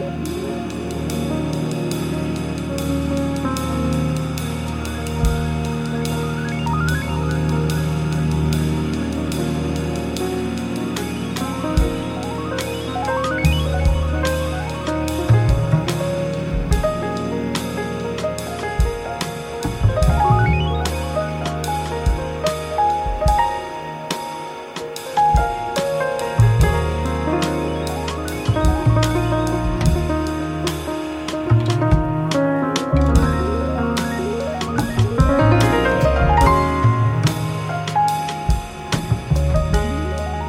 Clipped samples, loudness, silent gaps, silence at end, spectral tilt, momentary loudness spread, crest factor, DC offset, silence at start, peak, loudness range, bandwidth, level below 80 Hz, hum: under 0.1%; -20 LUFS; none; 0 s; -6 dB/octave; 8 LU; 18 dB; under 0.1%; 0 s; -2 dBFS; 5 LU; 16.5 kHz; -26 dBFS; none